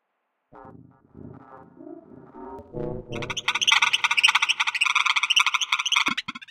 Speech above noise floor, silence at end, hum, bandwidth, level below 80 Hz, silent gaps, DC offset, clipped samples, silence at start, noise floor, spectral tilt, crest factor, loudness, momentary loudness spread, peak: 44 dB; 0.05 s; none; 17 kHz; -54 dBFS; none; under 0.1%; under 0.1%; 0.55 s; -76 dBFS; -0.5 dB/octave; 26 dB; -20 LUFS; 16 LU; 0 dBFS